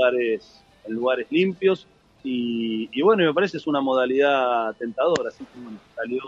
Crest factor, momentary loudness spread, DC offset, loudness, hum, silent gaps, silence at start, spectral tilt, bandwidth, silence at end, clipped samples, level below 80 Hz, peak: 16 dB; 15 LU; under 0.1%; -23 LUFS; none; none; 0 s; -6 dB/octave; 7.8 kHz; 0 s; under 0.1%; -66 dBFS; -6 dBFS